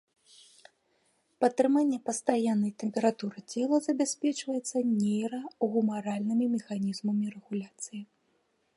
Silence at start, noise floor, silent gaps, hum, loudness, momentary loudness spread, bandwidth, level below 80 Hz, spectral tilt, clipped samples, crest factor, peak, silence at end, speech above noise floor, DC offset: 1.4 s; -73 dBFS; none; none; -30 LUFS; 10 LU; 11.5 kHz; -80 dBFS; -5.5 dB/octave; under 0.1%; 20 dB; -10 dBFS; 0.75 s; 44 dB; under 0.1%